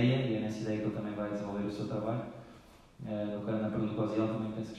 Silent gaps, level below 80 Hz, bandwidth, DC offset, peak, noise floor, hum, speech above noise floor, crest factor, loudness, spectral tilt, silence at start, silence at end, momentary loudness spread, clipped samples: none; -62 dBFS; 11 kHz; under 0.1%; -16 dBFS; -56 dBFS; none; 22 dB; 18 dB; -35 LUFS; -8 dB/octave; 0 s; 0 s; 8 LU; under 0.1%